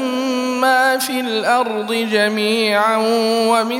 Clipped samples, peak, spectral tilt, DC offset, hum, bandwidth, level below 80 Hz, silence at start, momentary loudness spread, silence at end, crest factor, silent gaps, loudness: under 0.1%; -2 dBFS; -3 dB/octave; under 0.1%; none; 16.5 kHz; -78 dBFS; 0 s; 5 LU; 0 s; 14 dB; none; -16 LUFS